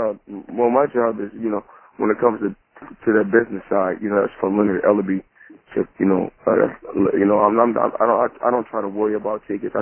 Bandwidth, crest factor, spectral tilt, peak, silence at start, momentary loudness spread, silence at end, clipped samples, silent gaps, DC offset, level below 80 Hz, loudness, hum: 3.3 kHz; 18 dB; -12 dB/octave; 0 dBFS; 0 s; 9 LU; 0 s; under 0.1%; none; under 0.1%; -56 dBFS; -20 LUFS; none